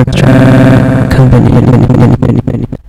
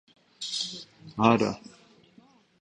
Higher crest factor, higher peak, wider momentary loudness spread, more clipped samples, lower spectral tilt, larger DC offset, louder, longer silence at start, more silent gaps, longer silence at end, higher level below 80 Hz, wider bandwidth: second, 4 dB vs 24 dB; first, 0 dBFS vs -6 dBFS; second, 6 LU vs 19 LU; first, 9% vs under 0.1%; first, -8.5 dB/octave vs -5 dB/octave; neither; first, -6 LUFS vs -27 LUFS; second, 0 s vs 0.4 s; neither; second, 0.1 s vs 1.05 s; first, -20 dBFS vs -62 dBFS; about the same, 11.5 kHz vs 10.5 kHz